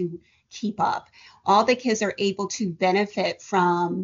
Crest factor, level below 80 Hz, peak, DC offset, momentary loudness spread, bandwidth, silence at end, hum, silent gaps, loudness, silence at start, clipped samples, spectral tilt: 18 dB; -66 dBFS; -6 dBFS; under 0.1%; 12 LU; 7.4 kHz; 0 s; none; none; -24 LUFS; 0 s; under 0.1%; -4 dB/octave